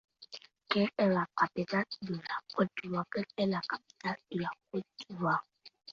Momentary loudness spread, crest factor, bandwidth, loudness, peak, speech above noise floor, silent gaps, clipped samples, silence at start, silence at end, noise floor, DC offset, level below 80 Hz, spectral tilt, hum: 14 LU; 22 dB; 7.2 kHz; -34 LUFS; -12 dBFS; 19 dB; none; under 0.1%; 0.2 s; 0 s; -53 dBFS; under 0.1%; -74 dBFS; -7 dB/octave; none